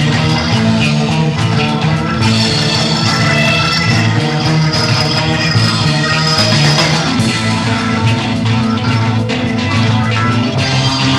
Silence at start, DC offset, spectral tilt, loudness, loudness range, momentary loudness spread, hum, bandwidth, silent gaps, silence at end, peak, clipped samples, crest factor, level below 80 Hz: 0 s; under 0.1%; -5 dB/octave; -12 LUFS; 2 LU; 4 LU; none; 12.5 kHz; none; 0 s; 0 dBFS; under 0.1%; 12 dB; -36 dBFS